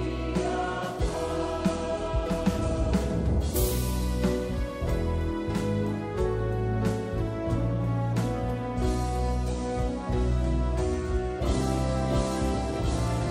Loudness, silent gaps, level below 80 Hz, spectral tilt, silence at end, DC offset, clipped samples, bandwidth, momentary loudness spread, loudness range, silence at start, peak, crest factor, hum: -29 LUFS; none; -32 dBFS; -6.5 dB/octave; 0 s; under 0.1%; under 0.1%; 16 kHz; 3 LU; 1 LU; 0 s; -12 dBFS; 14 dB; none